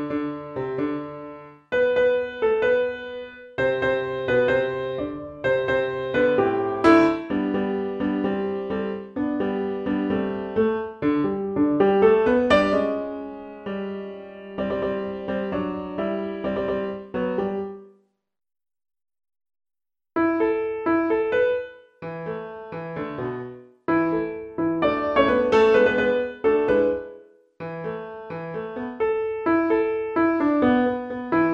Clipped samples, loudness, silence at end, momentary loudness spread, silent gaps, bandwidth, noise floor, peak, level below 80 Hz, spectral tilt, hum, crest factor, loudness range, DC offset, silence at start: under 0.1%; -23 LUFS; 0 s; 15 LU; none; 8.4 kHz; -60 dBFS; -4 dBFS; -52 dBFS; -7.5 dB/octave; none; 20 dB; 8 LU; under 0.1%; 0 s